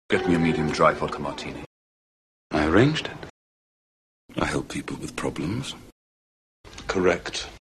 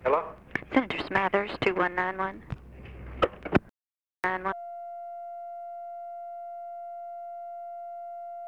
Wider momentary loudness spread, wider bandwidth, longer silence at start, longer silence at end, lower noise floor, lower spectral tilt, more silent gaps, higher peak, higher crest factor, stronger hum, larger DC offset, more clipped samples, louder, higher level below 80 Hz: first, 17 LU vs 13 LU; first, 13 kHz vs 11 kHz; about the same, 0.1 s vs 0 s; first, 0.15 s vs 0 s; about the same, under -90 dBFS vs under -90 dBFS; second, -5.5 dB/octave vs -7 dB/octave; first, 1.66-2.50 s, 3.30-4.29 s, 5.92-6.64 s vs none; about the same, -6 dBFS vs -8 dBFS; about the same, 22 dB vs 24 dB; neither; neither; neither; first, -25 LUFS vs -31 LUFS; first, -46 dBFS vs -52 dBFS